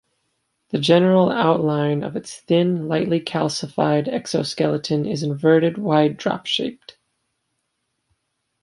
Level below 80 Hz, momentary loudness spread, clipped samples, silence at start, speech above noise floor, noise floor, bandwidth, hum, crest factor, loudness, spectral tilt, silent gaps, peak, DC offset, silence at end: -62 dBFS; 8 LU; under 0.1%; 0.75 s; 55 dB; -74 dBFS; 11.5 kHz; none; 18 dB; -20 LUFS; -6 dB/octave; none; -2 dBFS; under 0.1%; 1.9 s